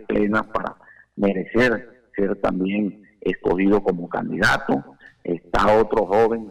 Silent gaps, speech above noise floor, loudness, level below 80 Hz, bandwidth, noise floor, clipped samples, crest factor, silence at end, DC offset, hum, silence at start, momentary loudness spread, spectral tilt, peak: none; 23 dB; -21 LUFS; -42 dBFS; 14 kHz; -43 dBFS; under 0.1%; 12 dB; 0 s; under 0.1%; none; 0 s; 11 LU; -6.5 dB/octave; -10 dBFS